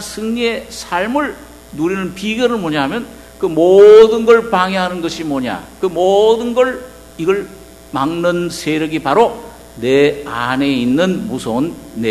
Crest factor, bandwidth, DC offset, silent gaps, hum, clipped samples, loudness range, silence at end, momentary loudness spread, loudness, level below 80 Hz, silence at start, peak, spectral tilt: 14 dB; 13.5 kHz; under 0.1%; none; none; 0.7%; 7 LU; 0 s; 13 LU; -14 LUFS; -44 dBFS; 0 s; 0 dBFS; -5.5 dB/octave